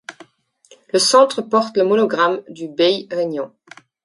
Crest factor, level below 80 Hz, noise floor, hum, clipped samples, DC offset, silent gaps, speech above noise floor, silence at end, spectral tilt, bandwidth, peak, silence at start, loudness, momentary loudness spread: 18 dB; -72 dBFS; -53 dBFS; none; under 0.1%; under 0.1%; none; 37 dB; 0.6 s; -3 dB/octave; 11.5 kHz; 0 dBFS; 0.1 s; -17 LUFS; 15 LU